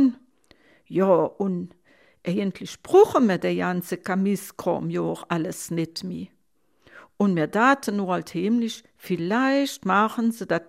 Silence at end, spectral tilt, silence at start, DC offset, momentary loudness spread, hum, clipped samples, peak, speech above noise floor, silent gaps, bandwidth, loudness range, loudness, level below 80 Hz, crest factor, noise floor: 0.05 s; -6 dB/octave; 0 s; under 0.1%; 11 LU; none; under 0.1%; -4 dBFS; 46 dB; none; 16 kHz; 5 LU; -23 LUFS; -66 dBFS; 20 dB; -69 dBFS